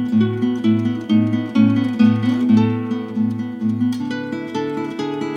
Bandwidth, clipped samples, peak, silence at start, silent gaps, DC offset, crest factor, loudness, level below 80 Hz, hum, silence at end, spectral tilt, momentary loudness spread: 7.2 kHz; under 0.1%; -4 dBFS; 0 s; none; under 0.1%; 14 dB; -19 LUFS; -62 dBFS; none; 0 s; -8 dB/octave; 9 LU